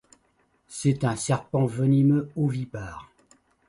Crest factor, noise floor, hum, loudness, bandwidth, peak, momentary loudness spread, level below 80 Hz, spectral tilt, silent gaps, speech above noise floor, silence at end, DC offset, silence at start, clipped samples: 16 dB; -67 dBFS; none; -25 LUFS; 11.5 kHz; -10 dBFS; 18 LU; -56 dBFS; -7 dB/octave; none; 43 dB; 0.65 s; under 0.1%; 0.7 s; under 0.1%